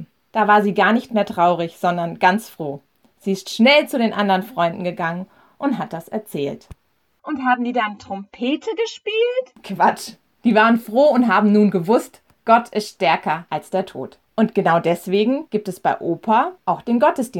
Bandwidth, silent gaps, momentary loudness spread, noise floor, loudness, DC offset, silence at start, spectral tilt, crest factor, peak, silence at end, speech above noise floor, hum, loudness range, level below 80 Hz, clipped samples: 16.5 kHz; none; 15 LU; -56 dBFS; -19 LUFS; under 0.1%; 0 s; -5.5 dB/octave; 18 dB; -2 dBFS; 0 s; 38 dB; none; 7 LU; -62 dBFS; under 0.1%